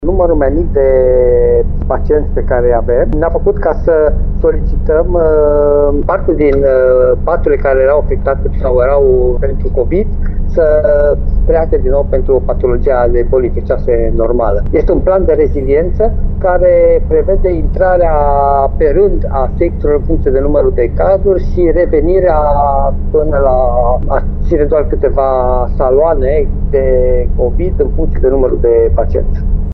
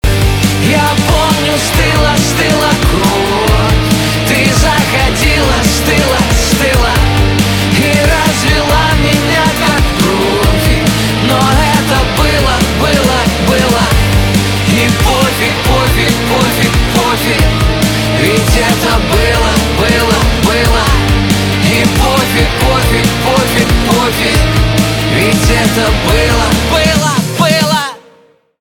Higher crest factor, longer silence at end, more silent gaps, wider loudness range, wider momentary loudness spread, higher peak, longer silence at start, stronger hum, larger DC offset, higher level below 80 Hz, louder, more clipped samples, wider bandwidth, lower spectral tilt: about the same, 10 dB vs 10 dB; second, 0 s vs 0.6 s; neither; about the same, 2 LU vs 1 LU; first, 5 LU vs 2 LU; about the same, 0 dBFS vs 0 dBFS; about the same, 0 s vs 0.05 s; neither; first, 0.8% vs under 0.1%; about the same, -14 dBFS vs -18 dBFS; about the same, -11 LUFS vs -10 LUFS; neither; second, 2.7 kHz vs 20 kHz; first, -11.5 dB/octave vs -4.5 dB/octave